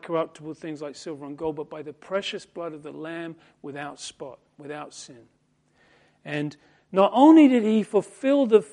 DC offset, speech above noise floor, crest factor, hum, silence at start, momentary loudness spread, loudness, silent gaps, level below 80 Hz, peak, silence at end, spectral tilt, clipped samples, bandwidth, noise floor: under 0.1%; 41 dB; 20 dB; none; 0.05 s; 23 LU; -22 LUFS; none; -70 dBFS; -4 dBFS; 0.1 s; -6 dB/octave; under 0.1%; 10.5 kHz; -65 dBFS